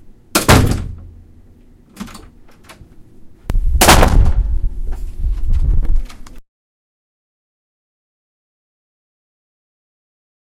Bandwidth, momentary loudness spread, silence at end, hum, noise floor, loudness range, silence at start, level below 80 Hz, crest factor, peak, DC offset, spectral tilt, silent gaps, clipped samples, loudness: 16.5 kHz; 23 LU; 4.05 s; none; -44 dBFS; 11 LU; 0.35 s; -20 dBFS; 16 dB; 0 dBFS; under 0.1%; -4 dB/octave; none; under 0.1%; -15 LUFS